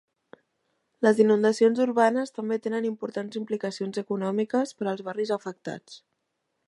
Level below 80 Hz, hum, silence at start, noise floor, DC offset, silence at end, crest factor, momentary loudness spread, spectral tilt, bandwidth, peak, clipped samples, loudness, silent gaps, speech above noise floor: -80 dBFS; none; 1 s; -78 dBFS; under 0.1%; 0.7 s; 20 dB; 12 LU; -6 dB/octave; 11.5 kHz; -8 dBFS; under 0.1%; -26 LUFS; none; 53 dB